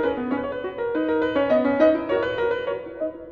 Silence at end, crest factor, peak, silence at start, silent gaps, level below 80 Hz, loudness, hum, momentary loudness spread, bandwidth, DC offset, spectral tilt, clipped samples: 0 s; 16 dB; -6 dBFS; 0 s; none; -52 dBFS; -23 LUFS; none; 10 LU; 6.4 kHz; under 0.1%; -7.5 dB/octave; under 0.1%